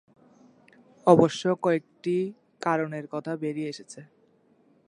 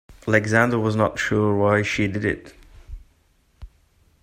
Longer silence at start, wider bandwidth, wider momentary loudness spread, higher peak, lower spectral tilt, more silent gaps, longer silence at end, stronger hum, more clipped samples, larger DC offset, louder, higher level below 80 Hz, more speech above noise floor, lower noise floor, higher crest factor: first, 1.05 s vs 0.1 s; second, 11 kHz vs 15 kHz; first, 16 LU vs 6 LU; about the same, -4 dBFS vs -2 dBFS; about the same, -6.5 dB/octave vs -6 dB/octave; neither; first, 0.85 s vs 0.55 s; neither; neither; neither; second, -26 LUFS vs -21 LUFS; second, -68 dBFS vs -46 dBFS; about the same, 38 dB vs 41 dB; about the same, -63 dBFS vs -61 dBFS; about the same, 24 dB vs 22 dB